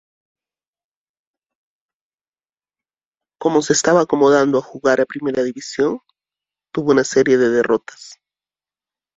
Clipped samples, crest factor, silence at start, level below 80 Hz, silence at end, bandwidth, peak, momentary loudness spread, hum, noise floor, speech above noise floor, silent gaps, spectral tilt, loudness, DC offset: under 0.1%; 18 dB; 3.4 s; -60 dBFS; 1 s; 8 kHz; -2 dBFS; 9 LU; none; under -90 dBFS; over 74 dB; none; -4.5 dB/octave; -17 LUFS; under 0.1%